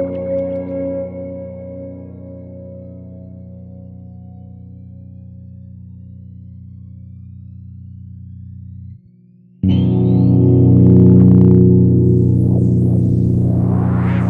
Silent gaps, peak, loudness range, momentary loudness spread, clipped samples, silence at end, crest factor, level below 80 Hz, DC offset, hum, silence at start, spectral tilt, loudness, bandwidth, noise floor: none; 0 dBFS; 25 LU; 27 LU; under 0.1%; 0 s; 16 dB; -40 dBFS; under 0.1%; 60 Hz at -55 dBFS; 0 s; -12 dB/octave; -13 LUFS; 3.4 kHz; -46 dBFS